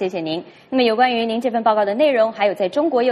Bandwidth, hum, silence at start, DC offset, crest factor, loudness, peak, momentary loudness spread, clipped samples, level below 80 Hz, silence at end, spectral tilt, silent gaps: 12 kHz; none; 0 s; under 0.1%; 14 dB; -18 LUFS; -4 dBFS; 8 LU; under 0.1%; -66 dBFS; 0 s; -5.5 dB/octave; none